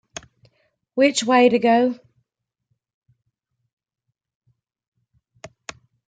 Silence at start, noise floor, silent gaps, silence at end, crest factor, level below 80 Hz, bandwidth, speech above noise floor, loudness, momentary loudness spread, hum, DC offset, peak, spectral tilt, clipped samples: 0.95 s; -80 dBFS; 2.94-3.02 s, 3.73-3.77 s, 4.35-4.41 s, 4.88-4.92 s; 0.6 s; 20 dB; -68 dBFS; 9.6 kHz; 63 dB; -18 LUFS; 23 LU; none; under 0.1%; -4 dBFS; -3.5 dB/octave; under 0.1%